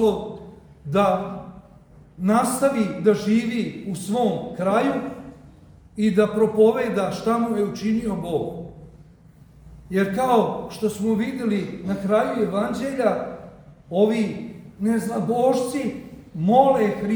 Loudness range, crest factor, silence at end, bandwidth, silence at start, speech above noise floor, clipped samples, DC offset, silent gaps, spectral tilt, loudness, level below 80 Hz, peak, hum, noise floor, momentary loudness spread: 3 LU; 20 dB; 0 s; over 20 kHz; 0 s; 28 dB; under 0.1%; under 0.1%; none; -6.5 dB/octave; -22 LUFS; -54 dBFS; -2 dBFS; none; -49 dBFS; 16 LU